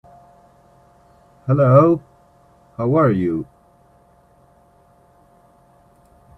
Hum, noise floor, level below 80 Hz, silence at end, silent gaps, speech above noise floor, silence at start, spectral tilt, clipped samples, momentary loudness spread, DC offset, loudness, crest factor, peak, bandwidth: none; -54 dBFS; -56 dBFS; 2.95 s; none; 39 dB; 1.45 s; -11 dB/octave; under 0.1%; 21 LU; under 0.1%; -17 LUFS; 22 dB; 0 dBFS; 4.2 kHz